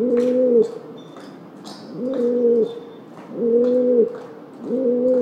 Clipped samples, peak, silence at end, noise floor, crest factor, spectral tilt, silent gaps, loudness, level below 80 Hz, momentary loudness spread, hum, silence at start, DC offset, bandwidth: under 0.1%; -6 dBFS; 0 s; -39 dBFS; 14 dB; -7.5 dB/octave; none; -19 LUFS; -72 dBFS; 22 LU; none; 0 s; under 0.1%; 8.2 kHz